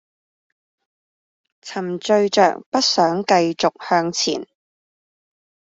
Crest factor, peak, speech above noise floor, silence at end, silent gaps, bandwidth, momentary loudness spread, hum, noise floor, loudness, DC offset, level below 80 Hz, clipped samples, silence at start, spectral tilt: 18 dB; -2 dBFS; over 72 dB; 1.35 s; 2.66-2.72 s; 8 kHz; 11 LU; none; under -90 dBFS; -18 LUFS; under 0.1%; -66 dBFS; under 0.1%; 1.65 s; -3.5 dB/octave